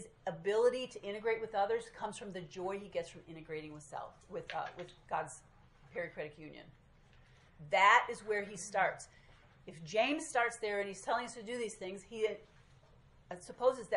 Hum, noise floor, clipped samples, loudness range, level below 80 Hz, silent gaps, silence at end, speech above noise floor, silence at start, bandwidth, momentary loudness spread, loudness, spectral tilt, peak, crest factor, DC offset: none; -63 dBFS; under 0.1%; 11 LU; -68 dBFS; none; 0 s; 26 dB; 0 s; 11.5 kHz; 18 LU; -36 LUFS; -3.5 dB/octave; -14 dBFS; 24 dB; under 0.1%